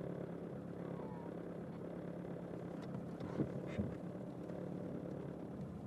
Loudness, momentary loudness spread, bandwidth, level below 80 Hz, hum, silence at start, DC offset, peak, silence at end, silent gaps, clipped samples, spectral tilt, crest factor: -46 LUFS; 5 LU; 12 kHz; -68 dBFS; none; 0 s; under 0.1%; -26 dBFS; 0 s; none; under 0.1%; -9 dB/octave; 20 dB